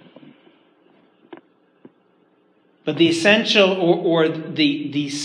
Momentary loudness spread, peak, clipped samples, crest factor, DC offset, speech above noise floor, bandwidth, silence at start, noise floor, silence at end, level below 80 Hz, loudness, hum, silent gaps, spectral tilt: 10 LU; -2 dBFS; under 0.1%; 20 dB; under 0.1%; 42 dB; 11 kHz; 1.3 s; -59 dBFS; 0 s; -74 dBFS; -18 LUFS; none; none; -4.5 dB/octave